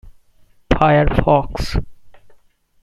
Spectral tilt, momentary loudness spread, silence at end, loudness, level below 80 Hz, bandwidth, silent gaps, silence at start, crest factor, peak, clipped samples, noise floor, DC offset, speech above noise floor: -7 dB/octave; 11 LU; 0.5 s; -17 LUFS; -28 dBFS; 12.5 kHz; none; 0.05 s; 18 dB; 0 dBFS; under 0.1%; -51 dBFS; under 0.1%; 36 dB